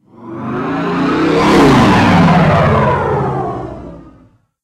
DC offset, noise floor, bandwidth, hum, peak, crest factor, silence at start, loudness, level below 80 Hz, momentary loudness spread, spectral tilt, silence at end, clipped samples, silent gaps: under 0.1%; -47 dBFS; 14 kHz; none; 0 dBFS; 12 dB; 0.2 s; -11 LUFS; -32 dBFS; 17 LU; -7 dB/octave; 0.55 s; under 0.1%; none